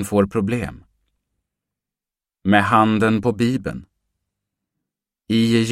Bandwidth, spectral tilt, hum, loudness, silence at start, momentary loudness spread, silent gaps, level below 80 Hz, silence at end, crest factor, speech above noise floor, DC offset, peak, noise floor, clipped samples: 14.5 kHz; -6 dB/octave; none; -19 LUFS; 0 s; 13 LU; none; -50 dBFS; 0 s; 20 dB; 71 dB; under 0.1%; 0 dBFS; -89 dBFS; under 0.1%